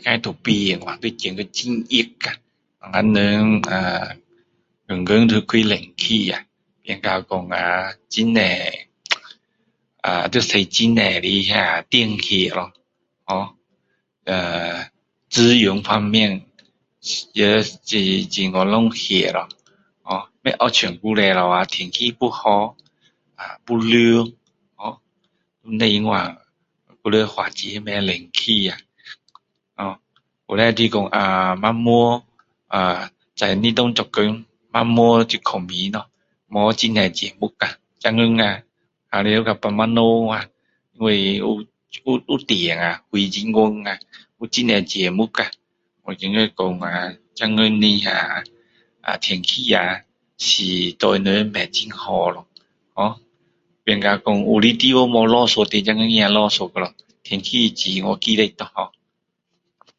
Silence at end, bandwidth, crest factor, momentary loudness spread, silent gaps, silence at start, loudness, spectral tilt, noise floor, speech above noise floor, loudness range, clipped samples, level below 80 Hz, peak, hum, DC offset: 1.1 s; 7.8 kHz; 20 dB; 13 LU; none; 0.05 s; -18 LUFS; -4.5 dB/octave; -75 dBFS; 56 dB; 4 LU; under 0.1%; -54 dBFS; 0 dBFS; none; under 0.1%